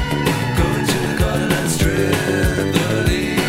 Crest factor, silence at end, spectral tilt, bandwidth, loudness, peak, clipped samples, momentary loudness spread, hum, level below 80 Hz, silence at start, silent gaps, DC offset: 14 dB; 0 s; -5 dB/octave; 16.5 kHz; -18 LUFS; -2 dBFS; under 0.1%; 1 LU; none; -28 dBFS; 0 s; none; under 0.1%